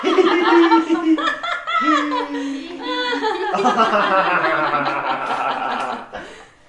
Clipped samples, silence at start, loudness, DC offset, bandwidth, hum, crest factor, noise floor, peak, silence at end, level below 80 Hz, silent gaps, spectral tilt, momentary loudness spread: under 0.1%; 0 s; -18 LUFS; under 0.1%; 10.5 kHz; none; 18 dB; -38 dBFS; -2 dBFS; 0.25 s; -58 dBFS; none; -4 dB/octave; 13 LU